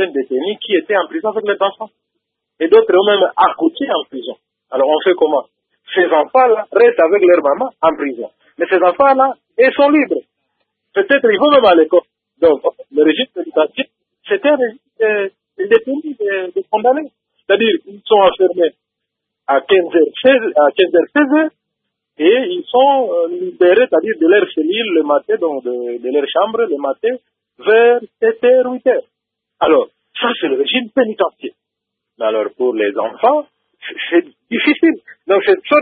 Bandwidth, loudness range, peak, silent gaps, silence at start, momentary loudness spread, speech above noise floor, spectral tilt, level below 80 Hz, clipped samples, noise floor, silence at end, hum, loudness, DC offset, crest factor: 4.7 kHz; 4 LU; 0 dBFS; none; 0 s; 10 LU; 65 dB; -7.5 dB/octave; -60 dBFS; under 0.1%; -78 dBFS; 0 s; none; -14 LUFS; under 0.1%; 14 dB